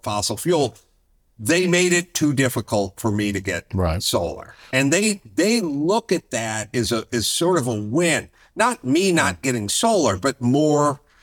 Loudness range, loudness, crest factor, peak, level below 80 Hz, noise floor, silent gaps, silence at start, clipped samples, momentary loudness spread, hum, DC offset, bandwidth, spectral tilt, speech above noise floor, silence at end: 2 LU; -20 LUFS; 18 dB; -4 dBFS; -48 dBFS; -61 dBFS; none; 0.05 s; under 0.1%; 7 LU; none; under 0.1%; 19.5 kHz; -4 dB/octave; 41 dB; 0.25 s